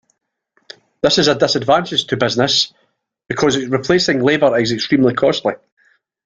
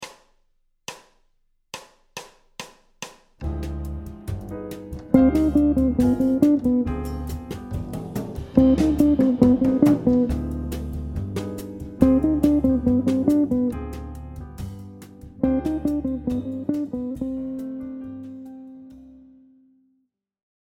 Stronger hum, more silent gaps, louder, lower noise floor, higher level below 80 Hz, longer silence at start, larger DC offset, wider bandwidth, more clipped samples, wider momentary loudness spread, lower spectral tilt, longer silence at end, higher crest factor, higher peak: neither; neither; first, -15 LUFS vs -22 LUFS; second, -43 dBFS vs -72 dBFS; second, -52 dBFS vs -36 dBFS; first, 1.05 s vs 0 s; neither; second, 9 kHz vs 16 kHz; neither; second, 6 LU vs 22 LU; second, -4 dB/octave vs -8 dB/octave; second, 0.7 s vs 1.5 s; second, 16 dB vs 22 dB; about the same, 0 dBFS vs 0 dBFS